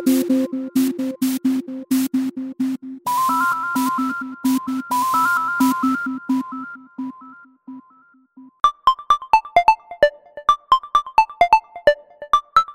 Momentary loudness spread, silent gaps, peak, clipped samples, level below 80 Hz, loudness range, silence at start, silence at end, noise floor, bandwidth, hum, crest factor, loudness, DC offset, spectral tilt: 9 LU; none; -2 dBFS; under 0.1%; -54 dBFS; 6 LU; 0 s; 0 s; -54 dBFS; 16.5 kHz; none; 16 dB; -19 LUFS; under 0.1%; -3.5 dB/octave